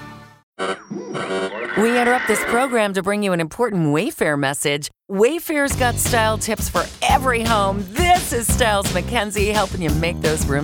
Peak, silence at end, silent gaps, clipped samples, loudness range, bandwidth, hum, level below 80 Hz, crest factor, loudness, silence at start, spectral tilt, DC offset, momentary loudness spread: -2 dBFS; 0 s; 0.43-0.53 s; under 0.1%; 2 LU; 19.5 kHz; none; -32 dBFS; 16 dB; -19 LUFS; 0 s; -4 dB/octave; under 0.1%; 8 LU